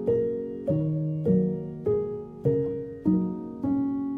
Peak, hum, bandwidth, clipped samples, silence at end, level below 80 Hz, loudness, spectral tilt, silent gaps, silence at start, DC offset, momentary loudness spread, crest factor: -12 dBFS; none; 3.3 kHz; under 0.1%; 0 s; -56 dBFS; -28 LUFS; -12.5 dB/octave; none; 0 s; under 0.1%; 7 LU; 14 dB